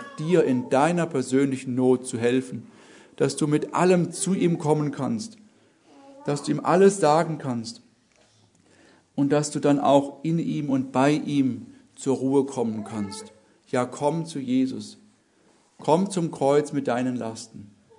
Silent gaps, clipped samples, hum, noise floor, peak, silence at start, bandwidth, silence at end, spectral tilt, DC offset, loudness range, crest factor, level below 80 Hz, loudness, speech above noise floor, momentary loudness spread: none; under 0.1%; none; -61 dBFS; -4 dBFS; 0 s; 11 kHz; 0.35 s; -6 dB/octave; under 0.1%; 4 LU; 20 dB; -72 dBFS; -24 LUFS; 38 dB; 12 LU